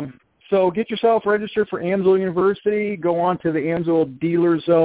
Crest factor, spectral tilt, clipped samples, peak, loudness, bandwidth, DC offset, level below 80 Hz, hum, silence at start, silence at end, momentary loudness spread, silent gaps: 14 dB; -11 dB/octave; under 0.1%; -6 dBFS; -20 LUFS; 4 kHz; under 0.1%; -58 dBFS; none; 0 s; 0 s; 4 LU; none